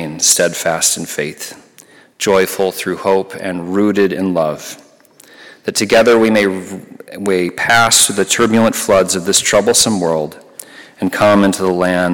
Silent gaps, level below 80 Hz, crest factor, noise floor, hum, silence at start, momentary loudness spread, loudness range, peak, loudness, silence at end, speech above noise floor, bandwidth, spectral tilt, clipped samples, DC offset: none; -50 dBFS; 14 dB; -45 dBFS; none; 0 s; 16 LU; 5 LU; 0 dBFS; -13 LUFS; 0 s; 31 dB; 17.5 kHz; -3 dB/octave; under 0.1%; under 0.1%